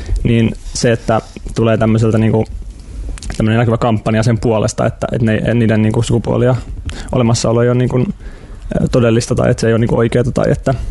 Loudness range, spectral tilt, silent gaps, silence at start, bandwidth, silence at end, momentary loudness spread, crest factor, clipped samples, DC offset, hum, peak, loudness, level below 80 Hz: 1 LU; -6.5 dB/octave; none; 0 s; 11.5 kHz; 0 s; 13 LU; 12 dB; under 0.1%; under 0.1%; none; -2 dBFS; -14 LUFS; -28 dBFS